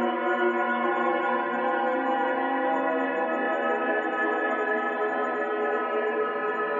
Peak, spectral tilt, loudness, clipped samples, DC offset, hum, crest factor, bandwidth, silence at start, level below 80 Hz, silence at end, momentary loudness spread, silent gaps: -12 dBFS; -5.5 dB/octave; -26 LUFS; under 0.1%; under 0.1%; none; 14 dB; 7.4 kHz; 0 s; -86 dBFS; 0 s; 2 LU; none